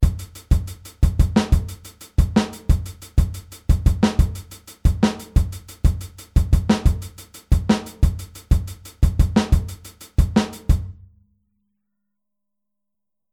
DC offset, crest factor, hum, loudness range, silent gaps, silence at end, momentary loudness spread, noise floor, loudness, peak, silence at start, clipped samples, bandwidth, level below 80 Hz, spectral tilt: under 0.1%; 18 dB; none; 3 LU; none; 2.4 s; 16 LU; -85 dBFS; -21 LUFS; -2 dBFS; 0 s; under 0.1%; 16 kHz; -22 dBFS; -6.5 dB/octave